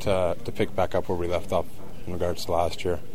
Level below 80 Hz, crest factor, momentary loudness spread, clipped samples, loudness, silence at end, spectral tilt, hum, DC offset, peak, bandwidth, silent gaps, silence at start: -44 dBFS; 18 dB; 7 LU; under 0.1%; -28 LUFS; 0 s; -6 dB/octave; none; 4%; -8 dBFS; 16 kHz; none; 0 s